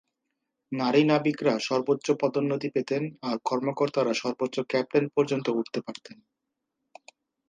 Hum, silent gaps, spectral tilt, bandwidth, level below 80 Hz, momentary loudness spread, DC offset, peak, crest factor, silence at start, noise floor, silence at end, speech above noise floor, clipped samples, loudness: none; none; -6 dB/octave; 9.4 kHz; -76 dBFS; 8 LU; under 0.1%; -8 dBFS; 20 dB; 0.7 s; -83 dBFS; 1.35 s; 57 dB; under 0.1%; -27 LUFS